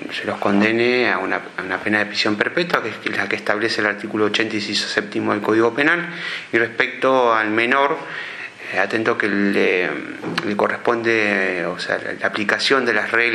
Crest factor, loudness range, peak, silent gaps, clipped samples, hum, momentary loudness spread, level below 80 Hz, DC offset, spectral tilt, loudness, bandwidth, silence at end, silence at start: 20 dB; 2 LU; 0 dBFS; none; under 0.1%; none; 8 LU; -68 dBFS; under 0.1%; -4.5 dB/octave; -19 LUFS; 12.5 kHz; 0 s; 0 s